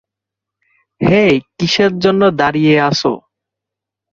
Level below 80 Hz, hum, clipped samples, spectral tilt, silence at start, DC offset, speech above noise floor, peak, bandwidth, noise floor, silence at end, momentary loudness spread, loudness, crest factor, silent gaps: -48 dBFS; none; under 0.1%; -5.5 dB/octave; 1 s; under 0.1%; 71 dB; 0 dBFS; 7.6 kHz; -83 dBFS; 0.95 s; 6 LU; -13 LUFS; 14 dB; none